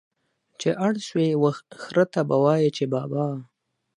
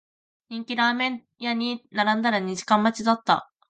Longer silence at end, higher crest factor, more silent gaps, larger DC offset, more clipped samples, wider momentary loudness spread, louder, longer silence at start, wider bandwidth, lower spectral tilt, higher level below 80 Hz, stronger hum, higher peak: first, 0.55 s vs 0.25 s; about the same, 18 dB vs 20 dB; neither; neither; neither; about the same, 8 LU vs 9 LU; about the same, -23 LUFS vs -24 LUFS; about the same, 0.6 s vs 0.5 s; first, 11 kHz vs 9 kHz; first, -7 dB/octave vs -4 dB/octave; about the same, -72 dBFS vs -72 dBFS; neither; about the same, -6 dBFS vs -6 dBFS